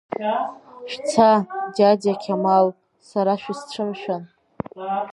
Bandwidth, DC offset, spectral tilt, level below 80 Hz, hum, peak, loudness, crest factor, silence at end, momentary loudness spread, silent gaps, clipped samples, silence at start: 11.5 kHz; under 0.1%; -6 dB/octave; -64 dBFS; none; -2 dBFS; -21 LUFS; 20 dB; 0 s; 15 LU; none; under 0.1%; 0.1 s